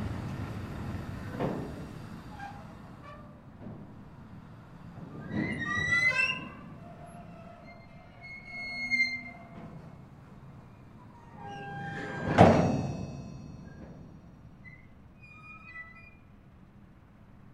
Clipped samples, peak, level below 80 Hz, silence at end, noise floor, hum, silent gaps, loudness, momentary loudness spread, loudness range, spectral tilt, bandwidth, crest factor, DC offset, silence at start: under 0.1%; -2 dBFS; -54 dBFS; 0 s; -55 dBFS; none; none; -30 LUFS; 25 LU; 18 LU; -6 dB/octave; 13.5 kHz; 32 dB; under 0.1%; 0 s